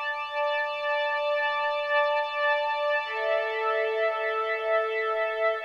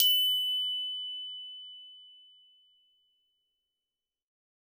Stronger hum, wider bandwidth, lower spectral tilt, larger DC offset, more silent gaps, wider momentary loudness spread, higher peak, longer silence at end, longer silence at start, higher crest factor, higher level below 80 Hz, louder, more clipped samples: neither; second, 7.4 kHz vs 19.5 kHz; first, -1 dB/octave vs 5 dB/octave; neither; neither; second, 3 LU vs 23 LU; second, -12 dBFS vs -8 dBFS; second, 0 s vs 2.5 s; about the same, 0 s vs 0 s; second, 14 dB vs 28 dB; first, -72 dBFS vs under -90 dBFS; first, -26 LUFS vs -29 LUFS; neither